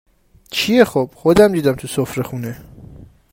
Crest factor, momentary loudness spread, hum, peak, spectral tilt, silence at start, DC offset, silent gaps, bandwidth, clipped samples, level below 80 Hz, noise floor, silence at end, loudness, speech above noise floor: 18 dB; 15 LU; none; 0 dBFS; -5.5 dB/octave; 0.5 s; under 0.1%; none; 16.5 kHz; under 0.1%; -44 dBFS; -40 dBFS; 0.25 s; -16 LUFS; 25 dB